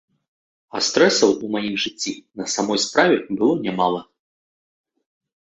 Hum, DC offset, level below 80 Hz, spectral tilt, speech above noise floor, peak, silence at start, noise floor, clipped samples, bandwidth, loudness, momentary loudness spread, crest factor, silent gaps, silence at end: none; under 0.1%; -64 dBFS; -3 dB/octave; over 70 dB; -2 dBFS; 0.75 s; under -90 dBFS; under 0.1%; 8.4 kHz; -20 LUFS; 12 LU; 20 dB; none; 1.6 s